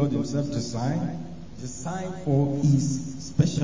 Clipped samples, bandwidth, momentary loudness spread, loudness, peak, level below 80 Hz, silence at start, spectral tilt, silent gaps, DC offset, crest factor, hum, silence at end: under 0.1%; 7.6 kHz; 14 LU; -26 LUFS; -8 dBFS; -50 dBFS; 0 s; -7 dB/octave; none; 0.8%; 18 dB; none; 0 s